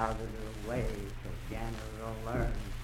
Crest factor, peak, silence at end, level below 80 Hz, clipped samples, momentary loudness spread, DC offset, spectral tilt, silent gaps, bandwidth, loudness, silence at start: 20 dB; -16 dBFS; 0 s; -40 dBFS; under 0.1%; 6 LU; under 0.1%; -6 dB/octave; none; 16 kHz; -39 LUFS; 0 s